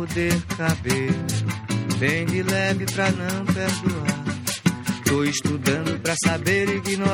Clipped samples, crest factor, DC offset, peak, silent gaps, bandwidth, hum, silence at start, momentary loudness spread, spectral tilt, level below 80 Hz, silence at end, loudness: under 0.1%; 18 dB; under 0.1%; -6 dBFS; none; 17 kHz; none; 0 s; 4 LU; -4.5 dB/octave; -48 dBFS; 0 s; -23 LUFS